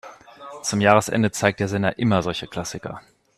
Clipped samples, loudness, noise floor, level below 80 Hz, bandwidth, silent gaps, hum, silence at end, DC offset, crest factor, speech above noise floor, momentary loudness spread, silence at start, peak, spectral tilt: under 0.1%; -21 LUFS; -41 dBFS; -54 dBFS; 14.5 kHz; none; none; 0.4 s; under 0.1%; 22 dB; 20 dB; 20 LU; 0.05 s; 0 dBFS; -5 dB/octave